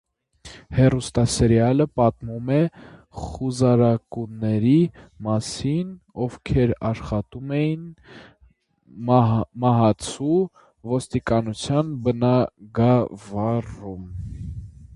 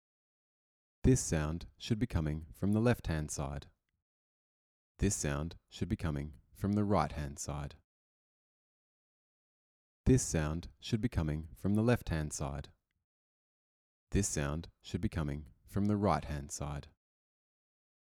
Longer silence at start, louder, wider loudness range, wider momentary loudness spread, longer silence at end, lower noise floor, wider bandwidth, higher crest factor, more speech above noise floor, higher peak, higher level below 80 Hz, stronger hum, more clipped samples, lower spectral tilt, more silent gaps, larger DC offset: second, 0.45 s vs 1.05 s; first, -22 LUFS vs -35 LUFS; about the same, 4 LU vs 5 LU; first, 16 LU vs 12 LU; second, 0.1 s vs 1.25 s; second, -58 dBFS vs under -90 dBFS; second, 11.5 kHz vs 17 kHz; about the same, 20 dB vs 20 dB; second, 37 dB vs over 56 dB; first, -2 dBFS vs -16 dBFS; first, -42 dBFS vs -48 dBFS; neither; neither; first, -7 dB/octave vs -5.5 dB/octave; second, none vs 4.02-4.95 s, 7.84-10.04 s, 13.04-14.07 s; neither